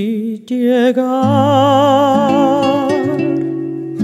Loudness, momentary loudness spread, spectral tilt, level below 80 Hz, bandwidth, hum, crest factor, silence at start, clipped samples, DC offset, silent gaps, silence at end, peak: -13 LUFS; 10 LU; -7 dB/octave; -62 dBFS; 14 kHz; none; 12 dB; 0 s; under 0.1%; under 0.1%; none; 0 s; 0 dBFS